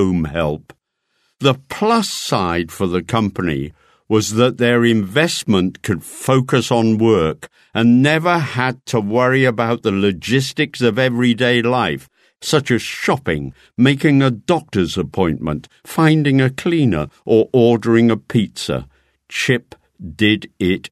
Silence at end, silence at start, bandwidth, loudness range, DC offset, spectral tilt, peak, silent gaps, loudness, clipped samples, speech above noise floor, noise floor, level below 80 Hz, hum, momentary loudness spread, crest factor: 0.05 s; 0 s; 13.5 kHz; 3 LU; under 0.1%; -5.5 dB/octave; 0 dBFS; none; -17 LUFS; under 0.1%; 51 dB; -67 dBFS; -44 dBFS; none; 9 LU; 16 dB